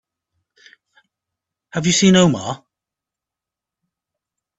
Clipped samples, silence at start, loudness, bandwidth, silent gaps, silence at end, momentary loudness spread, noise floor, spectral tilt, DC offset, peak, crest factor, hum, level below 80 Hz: under 0.1%; 1.75 s; -15 LUFS; 8.2 kHz; none; 2 s; 17 LU; -87 dBFS; -4.5 dB/octave; under 0.1%; -2 dBFS; 20 dB; none; -56 dBFS